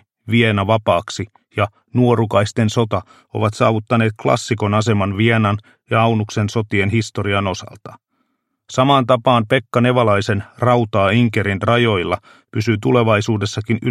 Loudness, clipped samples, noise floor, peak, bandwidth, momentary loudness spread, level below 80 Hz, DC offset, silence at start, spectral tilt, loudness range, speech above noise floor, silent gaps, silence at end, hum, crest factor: -17 LUFS; under 0.1%; -69 dBFS; 0 dBFS; 11.5 kHz; 8 LU; -52 dBFS; under 0.1%; 0.25 s; -6 dB/octave; 3 LU; 52 dB; none; 0 s; none; 16 dB